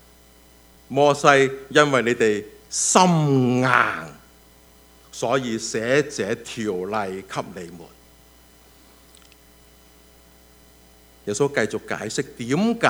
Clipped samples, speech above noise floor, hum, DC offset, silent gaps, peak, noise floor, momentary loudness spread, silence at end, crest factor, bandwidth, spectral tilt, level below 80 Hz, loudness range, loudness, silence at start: under 0.1%; 31 dB; none; under 0.1%; none; 0 dBFS; -52 dBFS; 15 LU; 0 s; 24 dB; over 20 kHz; -4 dB/octave; -56 dBFS; 14 LU; -21 LUFS; 0.9 s